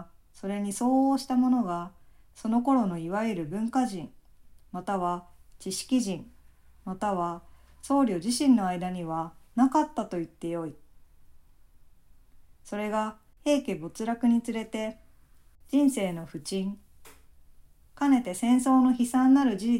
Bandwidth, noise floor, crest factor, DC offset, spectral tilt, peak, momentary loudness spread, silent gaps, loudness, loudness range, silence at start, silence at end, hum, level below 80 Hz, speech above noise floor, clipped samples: 15.5 kHz; -56 dBFS; 18 dB; under 0.1%; -5.5 dB/octave; -12 dBFS; 14 LU; none; -28 LUFS; 6 LU; 0 s; 0 s; none; -58 dBFS; 29 dB; under 0.1%